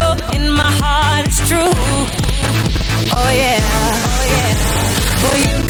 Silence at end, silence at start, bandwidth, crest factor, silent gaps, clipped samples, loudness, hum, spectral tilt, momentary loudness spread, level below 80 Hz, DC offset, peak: 0 s; 0 s; 19.5 kHz; 12 dB; none; under 0.1%; -14 LUFS; none; -4 dB/octave; 3 LU; -20 dBFS; under 0.1%; -2 dBFS